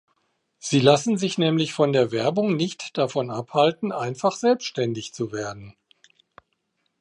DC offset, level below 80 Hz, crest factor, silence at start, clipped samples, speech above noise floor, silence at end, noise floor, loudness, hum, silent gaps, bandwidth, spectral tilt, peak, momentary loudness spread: under 0.1%; -68 dBFS; 22 dB; 0.65 s; under 0.1%; 51 dB; 1.3 s; -74 dBFS; -23 LUFS; none; none; 11 kHz; -5 dB/octave; -2 dBFS; 11 LU